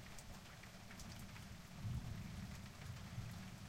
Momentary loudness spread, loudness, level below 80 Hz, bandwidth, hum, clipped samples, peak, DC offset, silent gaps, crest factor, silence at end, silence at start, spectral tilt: 8 LU; -52 LUFS; -60 dBFS; 16 kHz; none; under 0.1%; -34 dBFS; under 0.1%; none; 16 dB; 0 s; 0 s; -5 dB/octave